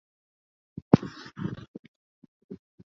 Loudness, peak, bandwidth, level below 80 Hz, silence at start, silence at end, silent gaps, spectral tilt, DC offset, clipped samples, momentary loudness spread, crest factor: -27 LUFS; -2 dBFS; 7.4 kHz; -58 dBFS; 0.9 s; 0.35 s; 1.68-2.22 s, 2.28-2.49 s; -8 dB/octave; under 0.1%; under 0.1%; 25 LU; 30 dB